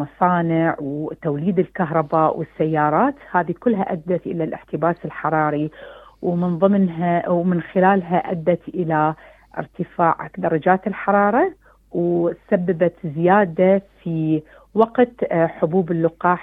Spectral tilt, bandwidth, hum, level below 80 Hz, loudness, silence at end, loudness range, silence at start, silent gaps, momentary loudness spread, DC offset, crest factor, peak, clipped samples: -10.5 dB/octave; 3.9 kHz; none; -56 dBFS; -20 LUFS; 0 s; 2 LU; 0 s; none; 9 LU; under 0.1%; 18 dB; -2 dBFS; under 0.1%